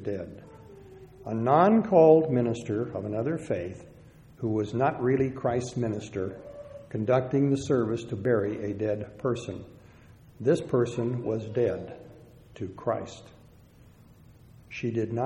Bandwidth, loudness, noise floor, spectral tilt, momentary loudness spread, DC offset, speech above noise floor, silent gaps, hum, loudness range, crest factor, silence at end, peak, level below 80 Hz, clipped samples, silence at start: 11 kHz; -27 LUFS; -54 dBFS; -7.5 dB/octave; 21 LU; under 0.1%; 28 dB; none; none; 9 LU; 20 dB; 0 s; -8 dBFS; -60 dBFS; under 0.1%; 0 s